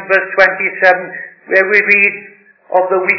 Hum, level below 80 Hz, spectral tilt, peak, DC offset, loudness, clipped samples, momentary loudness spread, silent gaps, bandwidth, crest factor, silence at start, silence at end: none; -58 dBFS; -5.5 dB/octave; 0 dBFS; under 0.1%; -11 LUFS; 0.5%; 13 LU; none; 5.4 kHz; 14 dB; 0 s; 0 s